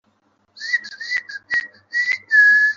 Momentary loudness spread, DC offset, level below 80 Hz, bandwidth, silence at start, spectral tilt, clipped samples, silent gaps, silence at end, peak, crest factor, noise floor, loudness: 13 LU; under 0.1%; -70 dBFS; 7.4 kHz; 0.55 s; 1.5 dB/octave; under 0.1%; none; 0 s; -4 dBFS; 14 dB; -63 dBFS; -18 LUFS